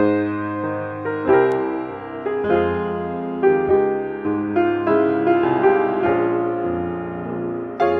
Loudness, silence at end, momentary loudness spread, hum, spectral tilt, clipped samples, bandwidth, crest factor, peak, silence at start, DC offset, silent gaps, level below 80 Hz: -20 LUFS; 0 s; 10 LU; none; -9 dB/octave; under 0.1%; 4.6 kHz; 16 dB; -4 dBFS; 0 s; under 0.1%; none; -52 dBFS